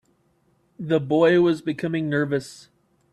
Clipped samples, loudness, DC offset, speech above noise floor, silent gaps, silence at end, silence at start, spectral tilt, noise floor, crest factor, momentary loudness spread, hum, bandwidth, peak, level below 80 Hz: under 0.1%; -22 LUFS; under 0.1%; 43 dB; none; 0.55 s; 0.8 s; -7 dB/octave; -65 dBFS; 16 dB; 12 LU; none; 11.5 kHz; -6 dBFS; -64 dBFS